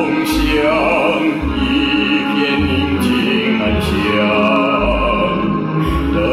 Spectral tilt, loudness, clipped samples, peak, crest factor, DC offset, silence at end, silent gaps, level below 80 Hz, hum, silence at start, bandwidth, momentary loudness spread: -6 dB/octave; -15 LUFS; under 0.1%; -4 dBFS; 12 dB; under 0.1%; 0 s; none; -26 dBFS; none; 0 s; 15.5 kHz; 4 LU